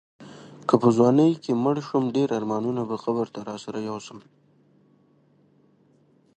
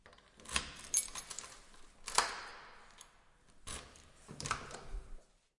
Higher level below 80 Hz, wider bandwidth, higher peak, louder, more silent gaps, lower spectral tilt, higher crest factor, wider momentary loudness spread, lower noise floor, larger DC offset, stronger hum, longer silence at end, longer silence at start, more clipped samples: second, -68 dBFS vs -56 dBFS; second, 9.4 kHz vs 11.5 kHz; first, -4 dBFS vs -10 dBFS; first, -24 LUFS vs -39 LUFS; neither; first, -7.5 dB/octave vs -0.5 dB/octave; second, 22 dB vs 34 dB; second, 17 LU vs 24 LU; second, -61 dBFS vs -65 dBFS; neither; neither; first, 2.2 s vs 0.35 s; first, 0.2 s vs 0.05 s; neither